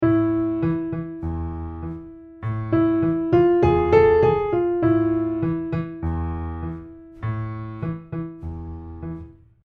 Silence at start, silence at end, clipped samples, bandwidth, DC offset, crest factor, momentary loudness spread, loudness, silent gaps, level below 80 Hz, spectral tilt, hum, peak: 0 s; 0.35 s; under 0.1%; 4.8 kHz; under 0.1%; 18 dB; 18 LU; -22 LUFS; none; -38 dBFS; -10.5 dB/octave; none; -4 dBFS